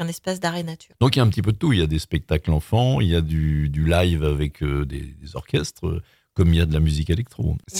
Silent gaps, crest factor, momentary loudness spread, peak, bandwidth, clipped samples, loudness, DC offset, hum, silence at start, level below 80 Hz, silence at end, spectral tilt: none; 20 dB; 11 LU; -2 dBFS; 16 kHz; under 0.1%; -22 LUFS; under 0.1%; none; 0 s; -30 dBFS; 0 s; -6.5 dB/octave